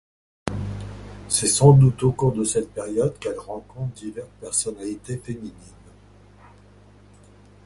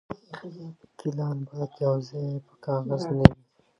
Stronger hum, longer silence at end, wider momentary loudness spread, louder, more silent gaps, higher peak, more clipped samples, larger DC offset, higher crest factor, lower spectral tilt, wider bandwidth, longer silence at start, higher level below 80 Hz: first, 50 Hz at -45 dBFS vs none; first, 2.15 s vs 0.45 s; about the same, 21 LU vs 22 LU; first, -22 LUFS vs -26 LUFS; neither; about the same, -2 dBFS vs 0 dBFS; neither; neither; about the same, 22 dB vs 26 dB; second, -5.5 dB/octave vs -8.5 dB/octave; first, 11.5 kHz vs 9 kHz; first, 0.45 s vs 0.1 s; about the same, -46 dBFS vs -42 dBFS